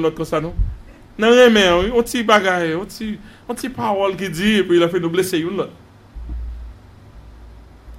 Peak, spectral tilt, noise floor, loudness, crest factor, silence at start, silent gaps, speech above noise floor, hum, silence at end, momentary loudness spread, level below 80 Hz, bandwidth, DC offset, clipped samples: 0 dBFS; -4.5 dB/octave; -42 dBFS; -17 LUFS; 18 dB; 0 s; none; 25 dB; none; 0 s; 20 LU; -34 dBFS; 16 kHz; under 0.1%; under 0.1%